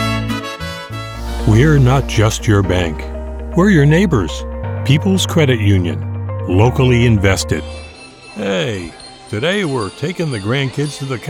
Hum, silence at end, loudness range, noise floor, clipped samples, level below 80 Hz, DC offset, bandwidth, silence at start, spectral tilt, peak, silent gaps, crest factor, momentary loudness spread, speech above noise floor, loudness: none; 0 s; 6 LU; -36 dBFS; under 0.1%; -28 dBFS; under 0.1%; 16 kHz; 0 s; -6 dB/octave; -2 dBFS; none; 14 dB; 15 LU; 23 dB; -15 LUFS